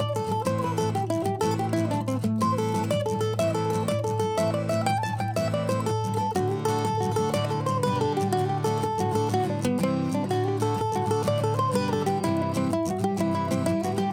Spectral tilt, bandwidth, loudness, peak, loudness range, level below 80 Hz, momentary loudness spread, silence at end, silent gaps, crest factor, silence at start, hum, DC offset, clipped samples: -6.5 dB/octave; 16.5 kHz; -26 LUFS; -10 dBFS; 1 LU; -56 dBFS; 2 LU; 0 s; none; 14 dB; 0 s; none; under 0.1%; under 0.1%